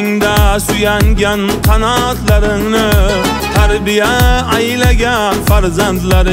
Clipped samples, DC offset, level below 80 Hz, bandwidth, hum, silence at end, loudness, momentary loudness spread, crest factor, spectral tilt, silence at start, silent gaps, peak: under 0.1%; under 0.1%; -16 dBFS; 16.5 kHz; none; 0 s; -11 LUFS; 2 LU; 10 dB; -5 dB/octave; 0 s; none; 0 dBFS